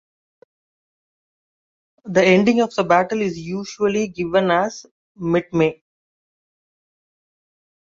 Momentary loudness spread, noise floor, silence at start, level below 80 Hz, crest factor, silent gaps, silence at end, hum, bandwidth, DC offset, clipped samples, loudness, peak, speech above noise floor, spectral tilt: 12 LU; under -90 dBFS; 2.05 s; -58 dBFS; 20 dB; 4.91-5.15 s; 2.1 s; none; 7.8 kHz; under 0.1%; under 0.1%; -19 LUFS; -2 dBFS; over 72 dB; -6 dB/octave